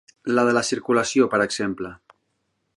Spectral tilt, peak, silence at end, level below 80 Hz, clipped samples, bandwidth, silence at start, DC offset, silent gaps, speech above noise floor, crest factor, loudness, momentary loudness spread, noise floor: -4 dB/octave; -4 dBFS; 0.8 s; -60 dBFS; under 0.1%; 11.5 kHz; 0.25 s; under 0.1%; none; 52 dB; 18 dB; -21 LUFS; 10 LU; -73 dBFS